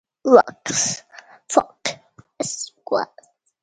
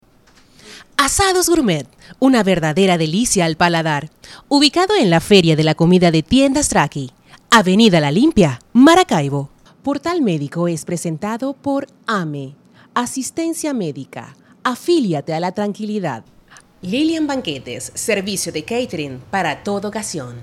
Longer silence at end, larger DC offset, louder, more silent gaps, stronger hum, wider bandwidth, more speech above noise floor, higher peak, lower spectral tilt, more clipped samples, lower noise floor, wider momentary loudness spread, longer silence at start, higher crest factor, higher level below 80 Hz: first, 0.6 s vs 0 s; neither; second, -20 LUFS vs -16 LUFS; neither; neither; second, 9.6 kHz vs 16 kHz; about the same, 34 dB vs 34 dB; about the same, 0 dBFS vs 0 dBFS; second, -2.5 dB/octave vs -4.5 dB/octave; neither; about the same, -53 dBFS vs -51 dBFS; about the same, 16 LU vs 14 LU; second, 0.25 s vs 0.65 s; first, 22 dB vs 16 dB; second, -64 dBFS vs -44 dBFS